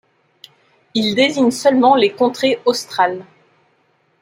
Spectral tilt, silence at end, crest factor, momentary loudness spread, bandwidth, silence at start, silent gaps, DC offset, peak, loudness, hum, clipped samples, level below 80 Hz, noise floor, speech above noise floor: -4 dB/octave; 1 s; 16 dB; 7 LU; 16 kHz; 0.95 s; none; under 0.1%; -2 dBFS; -15 LUFS; none; under 0.1%; -64 dBFS; -60 dBFS; 45 dB